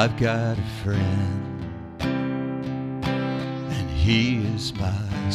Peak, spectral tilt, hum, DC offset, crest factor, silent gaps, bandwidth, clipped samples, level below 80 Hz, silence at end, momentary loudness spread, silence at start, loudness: -4 dBFS; -6.5 dB/octave; none; under 0.1%; 20 dB; none; 12.5 kHz; under 0.1%; -40 dBFS; 0 s; 9 LU; 0 s; -25 LUFS